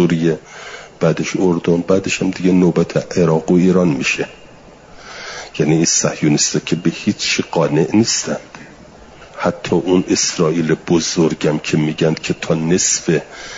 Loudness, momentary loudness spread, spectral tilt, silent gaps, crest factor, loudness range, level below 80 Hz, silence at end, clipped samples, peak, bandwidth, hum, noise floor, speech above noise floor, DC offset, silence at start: -16 LUFS; 11 LU; -4.5 dB/octave; none; 14 dB; 2 LU; -50 dBFS; 0 s; under 0.1%; -2 dBFS; 7.8 kHz; none; -41 dBFS; 25 dB; under 0.1%; 0 s